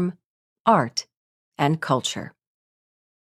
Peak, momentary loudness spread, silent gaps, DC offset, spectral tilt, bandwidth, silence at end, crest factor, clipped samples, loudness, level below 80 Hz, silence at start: -4 dBFS; 12 LU; 0.26-0.65 s, 1.17-1.52 s; under 0.1%; -5 dB/octave; 14.5 kHz; 0.95 s; 22 dB; under 0.1%; -23 LUFS; -66 dBFS; 0 s